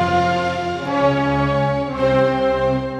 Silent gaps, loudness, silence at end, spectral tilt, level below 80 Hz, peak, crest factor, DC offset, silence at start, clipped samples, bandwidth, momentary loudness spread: none; -18 LUFS; 0 s; -7 dB/octave; -38 dBFS; -4 dBFS; 14 dB; under 0.1%; 0 s; under 0.1%; 9.4 kHz; 5 LU